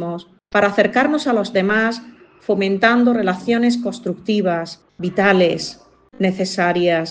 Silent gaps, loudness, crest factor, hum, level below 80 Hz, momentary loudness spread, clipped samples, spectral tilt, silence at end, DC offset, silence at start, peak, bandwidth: none; -18 LUFS; 16 dB; none; -58 dBFS; 12 LU; under 0.1%; -5.5 dB/octave; 0 s; under 0.1%; 0 s; -2 dBFS; 9.4 kHz